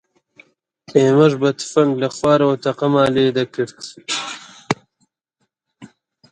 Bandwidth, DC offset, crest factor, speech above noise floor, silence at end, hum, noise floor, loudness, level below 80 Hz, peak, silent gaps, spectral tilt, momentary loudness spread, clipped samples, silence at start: 11 kHz; under 0.1%; 18 dB; 56 dB; 0.45 s; none; -72 dBFS; -17 LUFS; -60 dBFS; 0 dBFS; none; -5.5 dB/octave; 12 LU; under 0.1%; 0.9 s